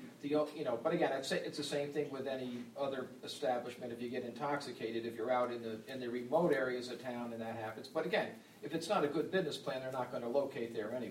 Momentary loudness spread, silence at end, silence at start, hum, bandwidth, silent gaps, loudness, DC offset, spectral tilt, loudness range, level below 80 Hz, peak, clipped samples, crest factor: 9 LU; 0 s; 0 s; none; 16 kHz; none; -39 LUFS; under 0.1%; -5 dB/octave; 3 LU; -80 dBFS; -20 dBFS; under 0.1%; 18 dB